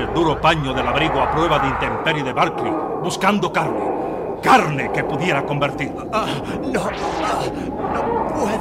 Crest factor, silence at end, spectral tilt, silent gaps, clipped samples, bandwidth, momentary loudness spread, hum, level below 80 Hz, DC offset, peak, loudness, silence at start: 16 dB; 0 s; -5.5 dB/octave; none; under 0.1%; 16 kHz; 7 LU; none; -40 dBFS; under 0.1%; -4 dBFS; -19 LUFS; 0 s